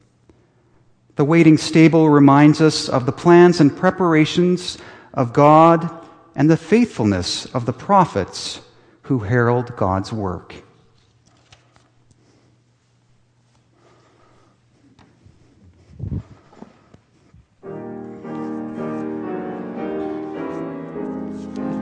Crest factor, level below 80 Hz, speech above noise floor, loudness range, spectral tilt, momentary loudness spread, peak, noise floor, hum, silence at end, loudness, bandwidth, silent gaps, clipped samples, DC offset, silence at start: 18 dB; -52 dBFS; 45 dB; 24 LU; -6.5 dB/octave; 19 LU; 0 dBFS; -59 dBFS; none; 0 s; -17 LUFS; 10 kHz; none; under 0.1%; under 0.1%; 1.2 s